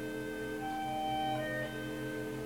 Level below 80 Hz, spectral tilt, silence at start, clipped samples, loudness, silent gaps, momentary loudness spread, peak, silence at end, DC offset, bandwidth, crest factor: -60 dBFS; -5 dB/octave; 0 s; under 0.1%; -37 LUFS; none; 5 LU; -24 dBFS; 0 s; under 0.1%; 17 kHz; 12 dB